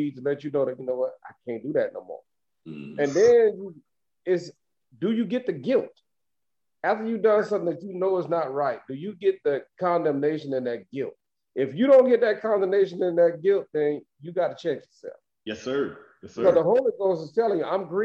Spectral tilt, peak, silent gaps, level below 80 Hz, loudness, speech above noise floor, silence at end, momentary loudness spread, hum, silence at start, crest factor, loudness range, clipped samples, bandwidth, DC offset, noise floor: -6.5 dB/octave; -6 dBFS; none; -72 dBFS; -25 LUFS; 63 dB; 0 s; 17 LU; none; 0 s; 18 dB; 6 LU; under 0.1%; 7.8 kHz; under 0.1%; -88 dBFS